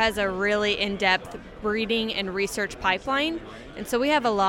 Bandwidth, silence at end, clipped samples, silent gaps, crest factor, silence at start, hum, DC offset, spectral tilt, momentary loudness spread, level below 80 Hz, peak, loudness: 16.5 kHz; 0 s; under 0.1%; none; 18 dB; 0 s; none; under 0.1%; -3.5 dB/octave; 10 LU; -48 dBFS; -6 dBFS; -25 LUFS